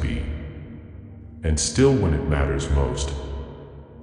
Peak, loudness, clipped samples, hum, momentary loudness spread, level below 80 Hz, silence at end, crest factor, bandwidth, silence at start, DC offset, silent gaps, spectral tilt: -4 dBFS; -23 LUFS; under 0.1%; none; 23 LU; -30 dBFS; 0 s; 18 dB; 10.5 kHz; 0 s; under 0.1%; none; -5.5 dB/octave